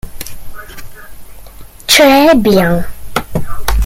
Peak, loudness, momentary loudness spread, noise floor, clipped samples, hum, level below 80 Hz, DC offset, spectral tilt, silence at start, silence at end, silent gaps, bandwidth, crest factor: 0 dBFS; -10 LUFS; 25 LU; -31 dBFS; under 0.1%; none; -24 dBFS; under 0.1%; -4 dB/octave; 0.05 s; 0 s; none; 16.5 kHz; 12 dB